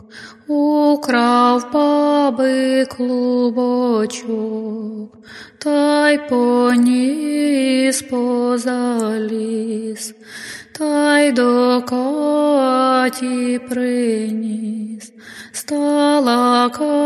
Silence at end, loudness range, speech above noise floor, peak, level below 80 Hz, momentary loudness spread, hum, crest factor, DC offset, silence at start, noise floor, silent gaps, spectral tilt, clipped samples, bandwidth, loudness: 0 s; 4 LU; 21 dB; 0 dBFS; -64 dBFS; 15 LU; none; 16 dB; under 0.1%; 0.15 s; -38 dBFS; none; -4 dB/octave; under 0.1%; 13.5 kHz; -16 LUFS